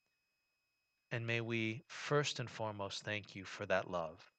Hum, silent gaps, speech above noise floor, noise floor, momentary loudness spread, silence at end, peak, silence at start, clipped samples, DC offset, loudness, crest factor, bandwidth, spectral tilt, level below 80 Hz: none; none; 45 dB; -85 dBFS; 9 LU; 0.15 s; -20 dBFS; 1.1 s; under 0.1%; under 0.1%; -40 LUFS; 22 dB; 9 kHz; -4.5 dB/octave; -78 dBFS